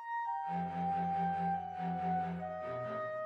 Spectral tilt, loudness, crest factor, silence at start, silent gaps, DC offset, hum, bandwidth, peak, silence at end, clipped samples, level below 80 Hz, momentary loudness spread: -8.5 dB/octave; -37 LUFS; 10 dB; 0 s; none; under 0.1%; none; 6.2 kHz; -26 dBFS; 0 s; under 0.1%; -70 dBFS; 5 LU